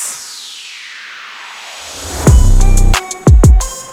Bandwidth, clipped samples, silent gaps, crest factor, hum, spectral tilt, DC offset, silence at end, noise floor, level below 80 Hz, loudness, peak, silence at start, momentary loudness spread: 15.5 kHz; under 0.1%; none; 10 dB; none; -5 dB/octave; under 0.1%; 0 s; -30 dBFS; -12 dBFS; -11 LUFS; 0 dBFS; 0 s; 19 LU